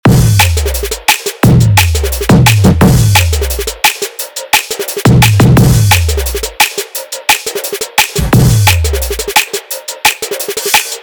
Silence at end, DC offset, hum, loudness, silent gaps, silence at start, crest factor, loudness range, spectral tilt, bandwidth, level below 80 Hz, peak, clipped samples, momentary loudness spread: 0 s; under 0.1%; none; -10 LUFS; none; 0.05 s; 10 dB; 3 LU; -4 dB/octave; over 20 kHz; -20 dBFS; 0 dBFS; 0.1%; 10 LU